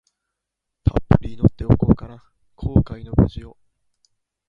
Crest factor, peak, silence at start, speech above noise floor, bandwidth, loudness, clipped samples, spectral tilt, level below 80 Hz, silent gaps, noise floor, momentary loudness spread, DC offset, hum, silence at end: 20 dB; 0 dBFS; 0.85 s; 62 dB; 5.4 kHz; -20 LUFS; under 0.1%; -11 dB/octave; -30 dBFS; none; -81 dBFS; 10 LU; under 0.1%; none; 1 s